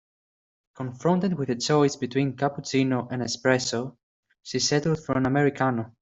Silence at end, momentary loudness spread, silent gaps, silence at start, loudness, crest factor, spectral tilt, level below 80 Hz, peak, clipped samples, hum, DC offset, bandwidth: 0.1 s; 8 LU; 4.03-4.23 s; 0.8 s; -25 LUFS; 20 dB; -5 dB/octave; -60 dBFS; -6 dBFS; under 0.1%; none; under 0.1%; 8.2 kHz